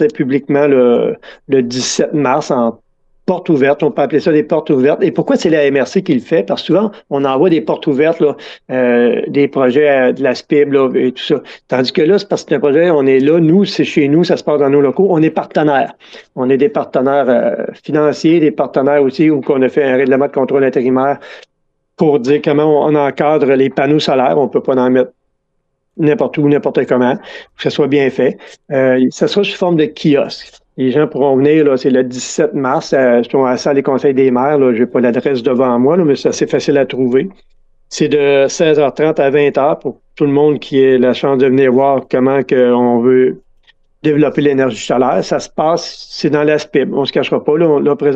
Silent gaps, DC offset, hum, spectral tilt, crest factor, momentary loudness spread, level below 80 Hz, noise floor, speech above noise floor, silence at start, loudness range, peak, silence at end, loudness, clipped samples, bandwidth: none; under 0.1%; none; -6 dB/octave; 12 dB; 6 LU; -56 dBFS; -66 dBFS; 54 dB; 0 s; 2 LU; 0 dBFS; 0 s; -12 LUFS; under 0.1%; 8.2 kHz